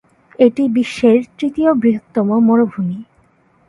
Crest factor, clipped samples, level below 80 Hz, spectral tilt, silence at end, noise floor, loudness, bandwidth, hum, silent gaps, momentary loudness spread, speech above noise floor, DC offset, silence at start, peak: 14 dB; under 0.1%; -56 dBFS; -7.5 dB/octave; 0.65 s; -54 dBFS; -15 LUFS; 11 kHz; none; none; 9 LU; 40 dB; under 0.1%; 0.4 s; 0 dBFS